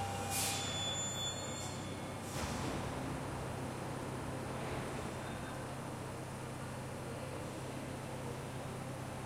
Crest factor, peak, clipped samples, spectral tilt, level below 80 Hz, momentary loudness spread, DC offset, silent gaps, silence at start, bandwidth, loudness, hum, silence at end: 16 dB; -24 dBFS; under 0.1%; -4 dB/octave; -58 dBFS; 8 LU; under 0.1%; none; 0 s; 16.5 kHz; -41 LUFS; none; 0 s